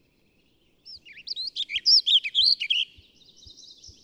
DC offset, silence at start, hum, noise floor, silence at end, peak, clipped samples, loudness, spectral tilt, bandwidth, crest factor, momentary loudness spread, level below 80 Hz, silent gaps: under 0.1%; 0.85 s; none; -65 dBFS; 1.2 s; -10 dBFS; under 0.1%; -20 LUFS; 2.5 dB/octave; 13.5 kHz; 18 dB; 18 LU; -66 dBFS; none